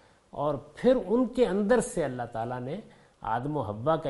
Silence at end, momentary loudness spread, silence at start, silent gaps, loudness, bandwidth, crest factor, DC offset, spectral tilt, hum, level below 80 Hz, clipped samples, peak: 0 s; 12 LU; 0.35 s; none; -28 LUFS; 11.5 kHz; 18 dB; under 0.1%; -6.5 dB/octave; none; -54 dBFS; under 0.1%; -12 dBFS